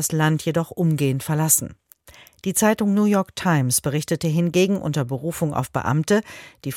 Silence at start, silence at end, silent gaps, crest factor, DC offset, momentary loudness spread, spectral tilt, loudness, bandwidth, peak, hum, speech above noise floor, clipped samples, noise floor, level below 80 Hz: 0 s; 0 s; none; 18 dB; under 0.1%; 6 LU; -5 dB/octave; -21 LUFS; 17 kHz; -2 dBFS; none; 29 dB; under 0.1%; -49 dBFS; -54 dBFS